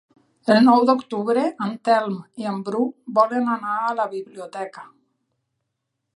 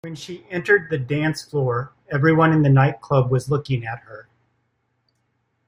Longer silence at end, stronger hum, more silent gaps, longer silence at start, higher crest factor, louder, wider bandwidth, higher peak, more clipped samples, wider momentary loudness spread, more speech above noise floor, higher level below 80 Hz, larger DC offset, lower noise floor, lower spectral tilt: about the same, 1.35 s vs 1.45 s; neither; neither; first, 0.45 s vs 0.05 s; about the same, 20 dB vs 18 dB; about the same, -21 LUFS vs -20 LUFS; about the same, 11 kHz vs 11.5 kHz; about the same, -2 dBFS vs -4 dBFS; neither; first, 17 LU vs 14 LU; first, 58 dB vs 50 dB; second, -76 dBFS vs -56 dBFS; neither; first, -78 dBFS vs -70 dBFS; about the same, -6.5 dB/octave vs -7.5 dB/octave